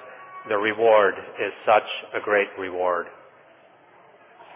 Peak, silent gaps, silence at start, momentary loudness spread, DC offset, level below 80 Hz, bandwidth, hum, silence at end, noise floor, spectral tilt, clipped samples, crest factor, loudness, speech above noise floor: -6 dBFS; none; 0 s; 12 LU; under 0.1%; -68 dBFS; 3.8 kHz; none; 0 s; -53 dBFS; -7.5 dB/octave; under 0.1%; 18 dB; -22 LUFS; 31 dB